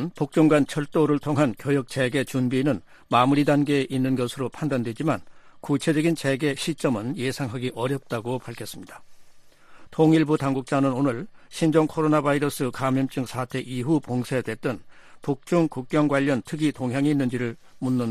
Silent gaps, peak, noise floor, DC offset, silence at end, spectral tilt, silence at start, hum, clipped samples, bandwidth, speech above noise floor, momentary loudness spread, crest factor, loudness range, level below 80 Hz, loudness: none; -6 dBFS; -48 dBFS; under 0.1%; 0 s; -6.5 dB/octave; 0 s; none; under 0.1%; 14.5 kHz; 24 dB; 11 LU; 18 dB; 4 LU; -58 dBFS; -24 LUFS